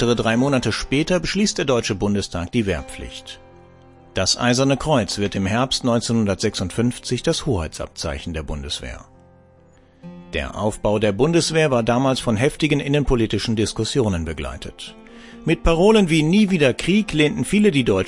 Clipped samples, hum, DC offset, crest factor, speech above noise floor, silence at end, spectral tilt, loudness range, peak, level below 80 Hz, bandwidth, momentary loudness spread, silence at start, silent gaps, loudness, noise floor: under 0.1%; none; under 0.1%; 18 dB; 32 dB; 0 s; -5 dB/octave; 7 LU; -2 dBFS; -36 dBFS; 11.5 kHz; 13 LU; 0 s; none; -20 LUFS; -51 dBFS